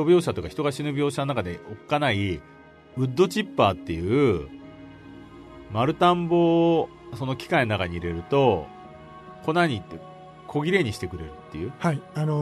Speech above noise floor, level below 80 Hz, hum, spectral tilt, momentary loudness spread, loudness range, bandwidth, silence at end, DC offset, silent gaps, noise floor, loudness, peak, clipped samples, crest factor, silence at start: 21 dB; -50 dBFS; none; -6.5 dB/octave; 23 LU; 4 LU; 13.5 kHz; 0 s; under 0.1%; none; -44 dBFS; -24 LUFS; -6 dBFS; under 0.1%; 18 dB; 0 s